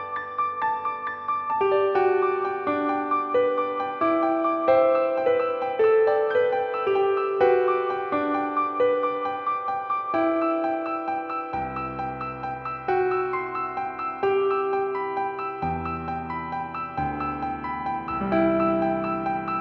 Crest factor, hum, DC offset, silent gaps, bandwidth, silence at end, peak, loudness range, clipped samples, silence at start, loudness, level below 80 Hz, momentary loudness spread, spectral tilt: 16 dB; none; under 0.1%; none; 5.8 kHz; 0 s; -8 dBFS; 6 LU; under 0.1%; 0 s; -25 LUFS; -54 dBFS; 9 LU; -8.5 dB/octave